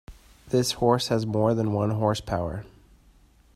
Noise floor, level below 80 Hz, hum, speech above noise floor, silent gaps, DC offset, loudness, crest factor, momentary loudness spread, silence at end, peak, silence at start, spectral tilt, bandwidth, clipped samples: -57 dBFS; -50 dBFS; none; 33 dB; none; under 0.1%; -25 LUFS; 20 dB; 7 LU; 0.9 s; -6 dBFS; 0.1 s; -6 dB/octave; 15 kHz; under 0.1%